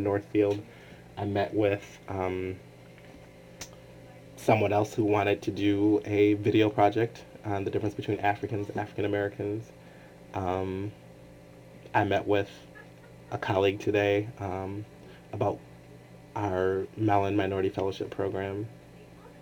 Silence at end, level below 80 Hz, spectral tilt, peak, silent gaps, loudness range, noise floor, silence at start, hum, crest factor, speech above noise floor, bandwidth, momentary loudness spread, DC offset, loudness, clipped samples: 0 s; -62 dBFS; -7 dB/octave; -10 dBFS; none; 7 LU; -50 dBFS; 0 s; none; 20 dB; 22 dB; over 20 kHz; 20 LU; under 0.1%; -29 LUFS; under 0.1%